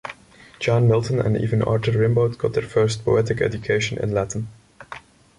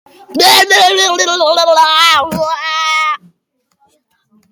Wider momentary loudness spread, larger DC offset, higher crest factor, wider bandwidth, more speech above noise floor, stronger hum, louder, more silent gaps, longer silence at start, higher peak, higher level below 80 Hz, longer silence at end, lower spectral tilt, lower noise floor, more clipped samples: first, 18 LU vs 10 LU; neither; about the same, 14 dB vs 12 dB; second, 11 kHz vs 20 kHz; second, 26 dB vs 55 dB; neither; second, -21 LUFS vs -9 LUFS; neither; second, 0.05 s vs 0.3 s; second, -8 dBFS vs 0 dBFS; first, -46 dBFS vs -54 dBFS; second, 0.4 s vs 1.35 s; first, -6.5 dB/octave vs -0.5 dB/octave; second, -46 dBFS vs -64 dBFS; neither